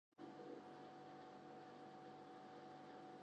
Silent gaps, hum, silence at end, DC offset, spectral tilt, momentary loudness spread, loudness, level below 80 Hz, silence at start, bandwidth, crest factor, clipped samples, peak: none; none; 0 s; under 0.1%; -6 dB/octave; 2 LU; -59 LUFS; under -90 dBFS; 0.2 s; 8.8 kHz; 14 dB; under 0.1%; -44 dBFS